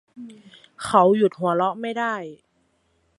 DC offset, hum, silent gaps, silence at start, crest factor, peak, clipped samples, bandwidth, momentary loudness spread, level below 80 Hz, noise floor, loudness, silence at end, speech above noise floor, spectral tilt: under 0.1%; none; none; 0.15 s; 22 dB; -2 dBFS; under 0.1%; 11.5 kHz; 25 LU; -64 dBFS; -67 dBFS; -21 LUFS; 0.85 s; 45 dB; -6 dB/octave